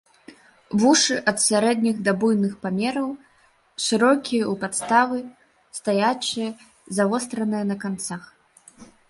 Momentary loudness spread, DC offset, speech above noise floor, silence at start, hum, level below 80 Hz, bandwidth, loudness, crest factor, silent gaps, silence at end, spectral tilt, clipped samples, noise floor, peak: 13 LU; under 0.1%; 38 dB; 0.3 s; none; -66 dBFS; 11.5 kHz; -22 LUFS; 20 dB; none; 0.25 s; -3.5 dB/octave; under 0.1%; -60 dBFS; -4 dBFS